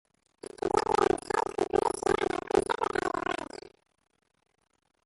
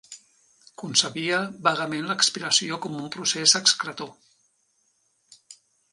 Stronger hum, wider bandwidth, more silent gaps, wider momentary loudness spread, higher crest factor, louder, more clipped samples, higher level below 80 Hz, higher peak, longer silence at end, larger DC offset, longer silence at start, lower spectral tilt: neither; about the same, 11.5 kHz vs 11.5 kHz; neither; about the same, 14 LU vs 14 LU; about the same, 20 dB vs 24 dB; second, -29 LUFS vs -22 LUFS; neither; first, -56 dBFS vs -74 dBFS; second, -10 dBFS vs -4 dBFS; first, 1.5 s vs 0.4 s; neither; first, 0.65 s vs 0.1 s; first, -4 dB/octave vs -1 dB/octave